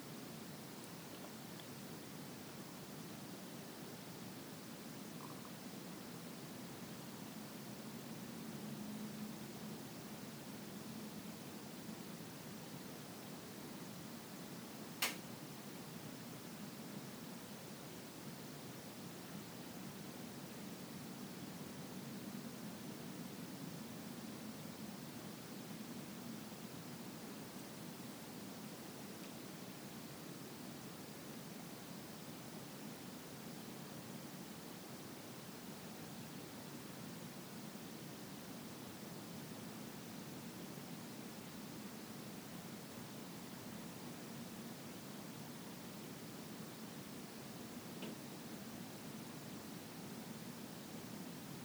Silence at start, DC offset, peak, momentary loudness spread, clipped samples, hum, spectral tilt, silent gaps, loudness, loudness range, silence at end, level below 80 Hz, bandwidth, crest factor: 0 s; under 0.1%; -22 dBFS; 2 LU; under 0.1%; none; -4 dB/octave; none; -50 LUFS; 3 LU; 0 s; -80 dBFS; over 20 kHz; 28 dB